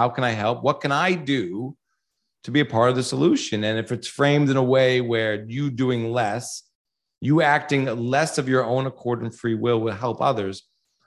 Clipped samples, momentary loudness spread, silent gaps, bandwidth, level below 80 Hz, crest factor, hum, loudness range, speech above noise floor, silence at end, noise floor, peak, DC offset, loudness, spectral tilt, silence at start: under 0.1%; 11 LU; 6.75-6.85 s; 12.5 kHz; -62 dBFS; 18 dB; none; 2 LU; 57 dB; 0.45 s; -78 dBFS; -4 dBFS; under 0.1%; -22 LUFS; -5.5 dB/octave; 0 s